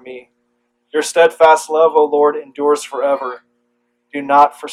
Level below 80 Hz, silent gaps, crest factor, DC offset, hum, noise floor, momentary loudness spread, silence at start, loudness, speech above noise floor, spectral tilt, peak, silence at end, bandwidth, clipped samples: -64 dBFS; none; 16 dB; under 0.1%; 60 Hz at -50 dBFS; -66 dBFS; 16 LU; 0.05 s; -14 LUFS; 52 dB; -2.5 dB/octave; 0 dBFS; 0 s; 14 kHz; under 0.1%